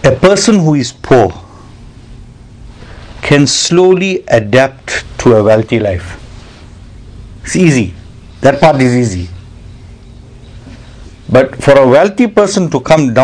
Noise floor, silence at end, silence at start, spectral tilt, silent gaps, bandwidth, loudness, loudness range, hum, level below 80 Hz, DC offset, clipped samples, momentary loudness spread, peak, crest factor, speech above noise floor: -33 dBFS; 0 s; 0 s; -5.5 dB/octave; none; 11 kHz; -9 LUFS; 4 LU; none; -34 dBFS; under 0.1%; 2%; 14 LU; 0 dBFS; 10 dB; 25 dB